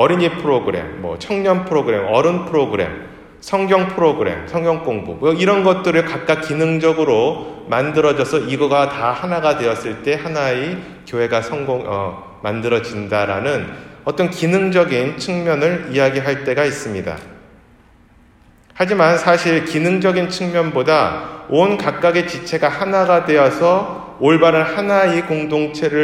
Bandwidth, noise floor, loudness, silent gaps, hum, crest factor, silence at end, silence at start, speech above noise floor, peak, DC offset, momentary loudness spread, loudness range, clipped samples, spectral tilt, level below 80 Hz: 13.5 kHz; -49 dBFS; -17 LUFS; none; none; 16 dB; 0 s; 0 s; 32 dB; 0 dBFS; under 0.1%; 10 LU; 6 LU; under 0.1%; -6 dB/octave; -50 dBFS